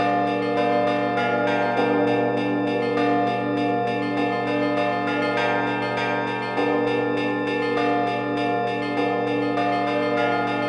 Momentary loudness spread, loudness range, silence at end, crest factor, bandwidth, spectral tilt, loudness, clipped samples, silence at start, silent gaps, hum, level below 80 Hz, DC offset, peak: 3 LU; 1 LU; 0 s; 14 dB; 10 kHz; -6.5 dB/octave; -22 LUFS; under 0.1%; 0 s; none; none; -64 dBFS; under 0.1%; -8 dBFS